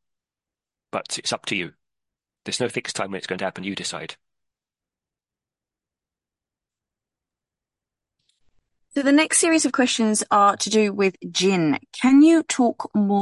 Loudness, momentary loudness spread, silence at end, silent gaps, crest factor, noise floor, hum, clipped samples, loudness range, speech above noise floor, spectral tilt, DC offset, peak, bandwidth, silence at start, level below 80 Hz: -20 LUFS; 13 LU; 0 s; none; 18 dB; under -90 dBFS; none; under 0.1%; 15 LU; over 70 dB; -3.5 dB/octave; under 0.1%; -6 dBFS; 11.5 kHz; 0.95 s; -68 dBFS